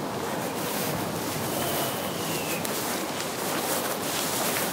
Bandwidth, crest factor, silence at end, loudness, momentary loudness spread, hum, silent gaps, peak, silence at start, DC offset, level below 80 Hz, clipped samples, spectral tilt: 16 kHz; 20 dB; 0 s; -28 LUFS; 4 LU; none; none; -8 dBFS; 0 s; under 0.1%; -62 dBFS; under 0.1%; -3 dB/octave